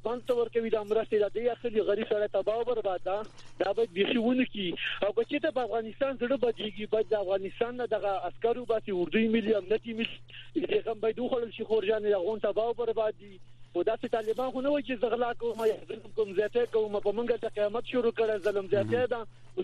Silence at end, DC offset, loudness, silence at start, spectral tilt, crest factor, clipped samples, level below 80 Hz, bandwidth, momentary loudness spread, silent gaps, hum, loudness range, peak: 0 s; under 0.1%; -30 LUFS; 0 s; -6.5 dB/octave; 18 dB; under 0.1%; -58 dBFS; 10.5 kHz; 6 LU; none; none; 1 LU; -12 dBFS